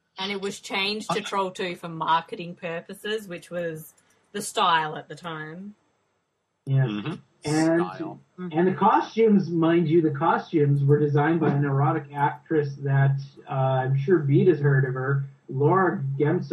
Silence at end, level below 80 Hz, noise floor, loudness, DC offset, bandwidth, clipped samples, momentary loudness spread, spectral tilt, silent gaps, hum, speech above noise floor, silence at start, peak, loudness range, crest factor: 0 s; -68 dBFS; -75 dBFS; -24 LUFS; under 0.1%; 13 kHz; under 0.1%; 14 LU; -6.5 dB/octave; none; none; 51 dB; 0.15 s; -6 dBFS; 7 LU; 18 dB